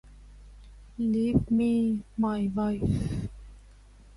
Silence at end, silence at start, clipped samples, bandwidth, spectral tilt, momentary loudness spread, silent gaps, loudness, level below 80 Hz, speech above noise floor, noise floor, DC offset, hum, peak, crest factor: 0.6 s; 0.05 s; under 0.1%; 11.5 kHz; -8.5 dB/octave; 10 LU; none; -28 LUFS; -44 dBFS; 26 dB; -52 dBFS; under 0.1%; 50 Hz at -45 dBFS; -10 dBFS; 18 dB